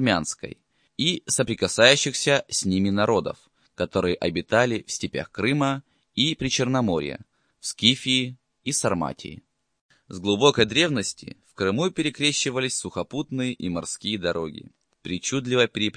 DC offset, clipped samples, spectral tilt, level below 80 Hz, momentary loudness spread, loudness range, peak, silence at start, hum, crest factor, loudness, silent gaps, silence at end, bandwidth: under 0.1%; under 0.1%; -3.5 dB/octave; -56 dBFS; 15 LU; 4 LU; -2 dBFS; 0 s; none; 24 dB; -23 LUFS; 9.81-9.89 s; 0 s; 10.5 kHz